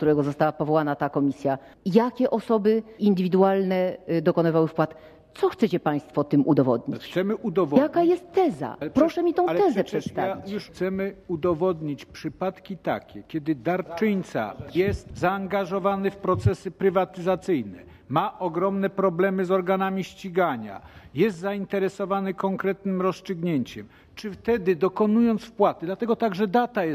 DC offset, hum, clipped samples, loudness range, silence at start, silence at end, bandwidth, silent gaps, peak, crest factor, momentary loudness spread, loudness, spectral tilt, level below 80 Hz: under 0.1%; none; under 0.1%; 5 LU; 0 s; 0 s; 15.5 kHz; none; -6 dBFS; 18 dB; 9 LU; -25 LUFS; -8 dB/octave; -52 dBFS